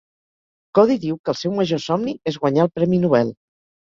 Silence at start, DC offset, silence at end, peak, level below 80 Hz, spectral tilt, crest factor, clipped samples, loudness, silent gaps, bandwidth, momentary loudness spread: 0.75 s; under 0.1%; 0.55 s; -2 dBFS; -58 dBFS; -7 dB/octave; 18 dB; under 0.1%; -20 LUFS; 1.19-1.24 s; 7.6 kHz; 7 LU